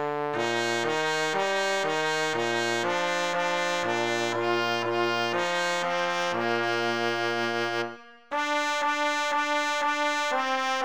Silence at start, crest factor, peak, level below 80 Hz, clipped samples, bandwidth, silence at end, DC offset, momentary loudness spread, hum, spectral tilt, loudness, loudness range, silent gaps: 0 s; 16 dB; -12 dBFS; -74 dBFS; under 0.1%; over 20 kHz; 0 s; 0.3%; 2 LU; none; -3 dB/octave; -26 LUFS; 1 LU; none